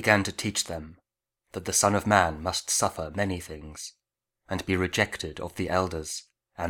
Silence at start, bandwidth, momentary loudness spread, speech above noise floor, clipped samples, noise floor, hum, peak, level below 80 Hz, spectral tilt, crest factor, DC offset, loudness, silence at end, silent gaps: 0 s; 19.5 kHz; 17 LU; 53 dB; under 0.1%; -81 dBFS; none; -4 dBFS; -50 dBFS; -3.5 dB/octave; 24 dB; under 0.1%; -27 LUFS; 0 s; none